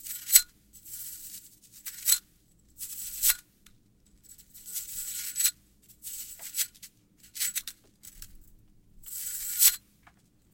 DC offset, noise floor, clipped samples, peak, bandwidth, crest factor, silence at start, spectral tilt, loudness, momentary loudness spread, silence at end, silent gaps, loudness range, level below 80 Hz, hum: under 0.1%; -63 dBFS; under 0.1%; -2 dBFS; 17 kHz; 32 dB; 0 s; 3 dB/octave; -27 LUFS; 23 LU; 0.75 s; none; 7 LU; -60 dBFS; none